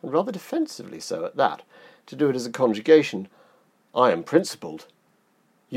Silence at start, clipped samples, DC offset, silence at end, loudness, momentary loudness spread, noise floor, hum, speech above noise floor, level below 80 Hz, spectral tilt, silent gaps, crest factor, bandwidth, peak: 0.05 s; under 0.1%; under 0.1%; 0 s; -23 LUFS; 20 LU; -65 dBFS; none; 41 dB; -76 dBFS; -5 dB/octave; none; 22 dB; 15 kHz; -4 dBFS